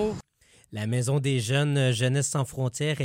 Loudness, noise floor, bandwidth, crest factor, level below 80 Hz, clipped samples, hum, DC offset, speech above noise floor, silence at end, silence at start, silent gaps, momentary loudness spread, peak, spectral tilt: -26 LUFS; -60 dBFS; 16 kHz; 14 dB; -58 dBFS; under 0.1%; none; under 0.1%; 35 dB; 0 s; 0 s; none; 9 LU; -12 dBFS; -5 dB/octave